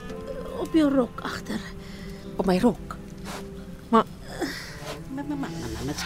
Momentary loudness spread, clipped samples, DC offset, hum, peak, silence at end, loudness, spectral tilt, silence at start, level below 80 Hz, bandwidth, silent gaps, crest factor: 16 LU; under 0.1%; under 0.1%; none; -6 dBFS; 0 s; -28 LUFS; -6 dB/octave; 0 s; -44 dBFS; 16 kHz; none; 22 dB